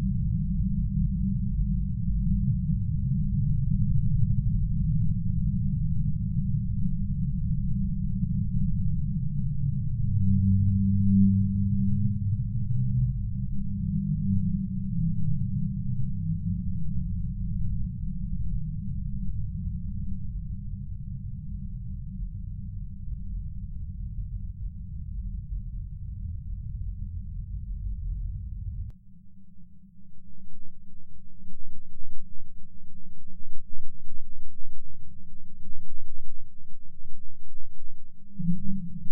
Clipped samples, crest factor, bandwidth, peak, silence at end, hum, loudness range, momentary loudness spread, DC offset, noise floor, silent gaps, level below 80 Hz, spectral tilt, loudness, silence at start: under 0.1%; 14 dB; 0.3 kHz; -8 dBFS; 0 s; none; 24 LU; 21 LU; under 0.1%; -43 dBFS; none; -34 dBFS; -15.5 dB/octave; -30 LUFS; 0 s